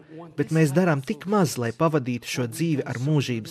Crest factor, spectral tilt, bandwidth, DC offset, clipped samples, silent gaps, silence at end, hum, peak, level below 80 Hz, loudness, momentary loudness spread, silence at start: 16 dB; -6 dB/octave; 14.5 kHz; under 0.1%; under 0.1%; none; 0 s; none; -8 dBFS; -64 dBFS; -24 LUFS; 8 LU; 0.1 s